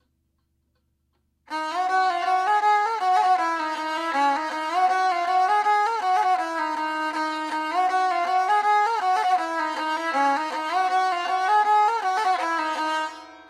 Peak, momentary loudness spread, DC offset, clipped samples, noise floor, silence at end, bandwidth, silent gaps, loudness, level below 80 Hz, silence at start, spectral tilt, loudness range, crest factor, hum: -10 dBFS; 6 LU; under 0.1%; under 0.1%; -71 dBFS; 0.05 s; 13.5 kHz; none; -23 LUFS; -72 dBFS; 1.5 s; -1 dB/octave; 1 LU; 14 dB; none